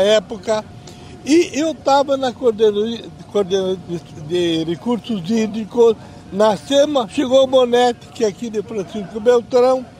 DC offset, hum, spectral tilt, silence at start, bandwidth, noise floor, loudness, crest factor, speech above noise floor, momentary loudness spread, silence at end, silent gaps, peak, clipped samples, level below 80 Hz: under 0.1%; none; -5 dB/octave; 0 s; 13 kHz; -37 dBFS; -17 LUFS; 16 dB; 20 dB; 12 LU; 0.1 s; none; -2 dBFS; under 0.1%; -52 dBFS